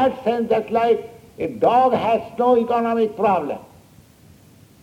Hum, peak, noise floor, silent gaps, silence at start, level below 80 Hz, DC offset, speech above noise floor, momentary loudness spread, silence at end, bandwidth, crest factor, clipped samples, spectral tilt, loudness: none; -4 dBFS; -49 dBFS; none; 0 s; -58 dBFS; under 0.1%; 30 dB; 13 LU; 1.2 s; 15.5 kHz; 16 dB; under 0.1%; -7 dB/octave; -19 LUFS